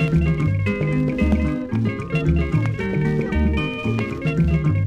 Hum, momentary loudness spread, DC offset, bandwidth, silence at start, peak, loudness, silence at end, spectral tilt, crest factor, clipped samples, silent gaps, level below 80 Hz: none; 4 LU; under 0.1%; 8.4 kHz; 0 s; -4 dBFS; -21 LUFS; 0 s; -8.5 dB/octave; 14 dB; under 0.1%; none; -28 dBFS